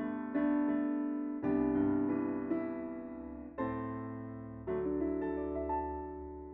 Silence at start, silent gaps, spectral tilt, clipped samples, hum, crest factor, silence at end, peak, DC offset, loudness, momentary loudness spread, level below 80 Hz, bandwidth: 0 s; none; -8.5 dB/octave; under 0.1%; none; 14 dB; 0 s; -20 dBFS; under 0.1%; -36 LUFS; 13 LU; -56 dBFS; 3.8 kHz